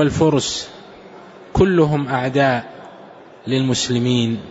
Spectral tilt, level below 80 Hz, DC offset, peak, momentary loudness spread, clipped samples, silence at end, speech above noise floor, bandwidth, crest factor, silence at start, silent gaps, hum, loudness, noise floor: -5.5 dB/octave; -40 dBFS; under 0.1%; -4 dBFS; 19 LU; under 0.1%; 0 s; 24 dB; 8 kHz; 16 dB; 0 s; none; none; -18 LUFS; -41 dBFS